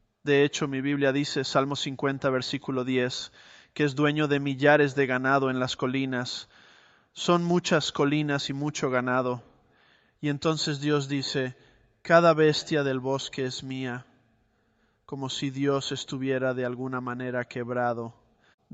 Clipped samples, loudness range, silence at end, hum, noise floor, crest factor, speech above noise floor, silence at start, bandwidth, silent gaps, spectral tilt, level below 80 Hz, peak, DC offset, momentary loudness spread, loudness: under 0.1%; 6 LU; 0.65 s; none; -69 dBFS; 22 dB; 42 dB; 0.25 s; 8.2 kHz; none; -5 dB/octave; -66 dBFS; -6 dBFS; under 0.1%; 11 LU; -27 LUFS